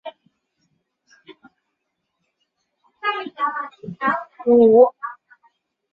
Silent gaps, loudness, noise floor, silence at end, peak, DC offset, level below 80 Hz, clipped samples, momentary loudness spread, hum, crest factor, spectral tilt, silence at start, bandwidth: none; -18 LUFS; -76 dBFS; 0.8 s; -2 dBFS; under 0.1%; -68 dBFS; under 0.1%; 21 LU; none; 20 dB; -8 dB/octave; 0.05 s; 4.8 kHz